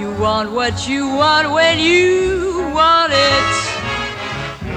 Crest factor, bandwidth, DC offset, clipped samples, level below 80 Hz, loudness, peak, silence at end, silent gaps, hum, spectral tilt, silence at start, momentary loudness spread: 14 dB; 11 kHz; under 0.1%; under 0.1%; -38 dBFS; -15 LUFS; -2 dBFS; 0 s; none; none; -3.5 dB/octave; 0 s; 10 LU